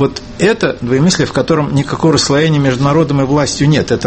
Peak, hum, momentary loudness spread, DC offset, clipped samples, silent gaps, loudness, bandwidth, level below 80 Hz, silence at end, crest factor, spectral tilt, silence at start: 0 dBFS; none; 4 LU; under 0.1%; under 0.1%; none; -12 LUFS; 8.8 kHz; -36 dBFS; 0 s; 12 dB; -5.5 dB/octave; 0 s